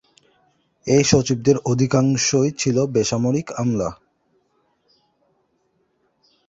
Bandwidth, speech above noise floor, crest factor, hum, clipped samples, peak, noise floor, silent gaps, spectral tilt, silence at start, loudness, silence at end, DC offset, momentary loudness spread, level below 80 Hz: 8 kHz; 48 dB; 20 dB; none; under 0.1%; -2 dBFS; -67 dBFS; none; -5 dB/octave; 0.85 s; -19 LUFS; 2.55 s; under 0.1%; 6 LU; -50 dBFS